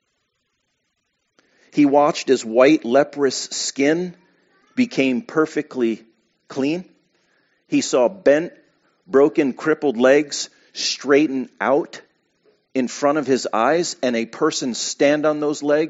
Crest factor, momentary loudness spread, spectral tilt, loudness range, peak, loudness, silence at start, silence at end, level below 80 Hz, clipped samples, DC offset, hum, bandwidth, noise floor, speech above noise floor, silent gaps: 18 dB; 10 LU; -3.5 dB/octave; 5 LU; -2 dBFS; -19 LUFS; 1.75 s; 0 s; -70 dBFS; under 0.1%; under 0.1%; none; 8 kHz; -72 dBFS; 54 dB; none